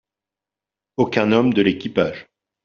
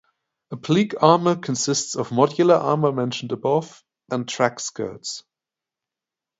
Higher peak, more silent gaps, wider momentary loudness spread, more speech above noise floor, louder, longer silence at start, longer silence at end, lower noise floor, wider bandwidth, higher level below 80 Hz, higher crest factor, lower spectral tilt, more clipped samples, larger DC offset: about the same, -2 dBFS vs 0 dBFS; neither; second, 12 LU vs 15 LU; about the same, 70 dB vs 67 dB; about the same, -19 LUFS vs -21 LUFS; first, 1 s vs 0.5 s; second, 0.45 s vs 1.2 s; about the same, -88 dBFS vs -88 dBFS; second, 7 kHz vs 8 kHz; first, -56 dBFS vs -66 dBFS; about the same, 18 dB vs 22 dB; about the same, -5 dB/octave vs -5 dB/octave; neither; neither